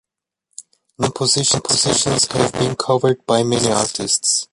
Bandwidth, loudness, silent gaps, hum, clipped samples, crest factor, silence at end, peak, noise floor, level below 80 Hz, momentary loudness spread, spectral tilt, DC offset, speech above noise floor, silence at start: 11.5 kHz; -16 LUFS; none; none; under 0.1%; 16 dB; 0.1 s; -2 dBFS; -80 dBFS; -50 dBFS; 4 LU; -3 dB/octave; under 0.1%; 63 dB; 0.6 s